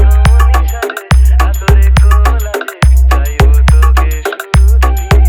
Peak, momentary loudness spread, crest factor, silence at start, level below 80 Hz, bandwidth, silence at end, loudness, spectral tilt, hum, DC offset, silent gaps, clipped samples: 0 dBFS; 7 LU; 6 dB; 0 s; -8 dBFS; 15 kHz; 0 s; -10 LUFS; -5.5 dB/octave; none; under 0.1%; none; 0.4%